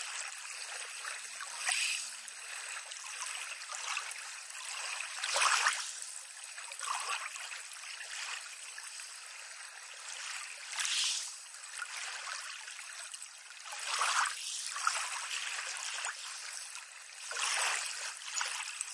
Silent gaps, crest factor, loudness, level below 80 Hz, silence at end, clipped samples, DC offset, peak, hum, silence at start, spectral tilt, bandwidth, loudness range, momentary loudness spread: none; 26 dB; -37 LUFS; under -90 dBFS; 0 s; under 0.1%; under 0.1%; -14 dBFS; none; 0 s; 7.5 dB/octave; 11.5 kHz; 6 LU; 13 LU